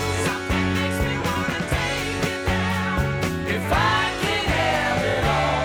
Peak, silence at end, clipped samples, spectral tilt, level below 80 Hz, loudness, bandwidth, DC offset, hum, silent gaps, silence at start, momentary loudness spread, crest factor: -10 dBFS; 0 s; under 0.1%; -4.5 dB/octave; -34 dBFS; -22 LUFS; over 20 kHz; under 0.1%; none; none; 0 s; 4 LU; 12 dB